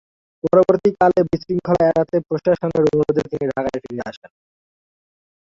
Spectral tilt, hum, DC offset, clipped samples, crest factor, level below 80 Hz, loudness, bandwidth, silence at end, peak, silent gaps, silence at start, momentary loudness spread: -8.5 dB/octave; none; under 0.1%; under 0.1%; 16 dB; -50 dBFS; -18 LUFS; 7.6 kHz; 1.25 s; -2 dBFS; none; 0.45 s; 12 LU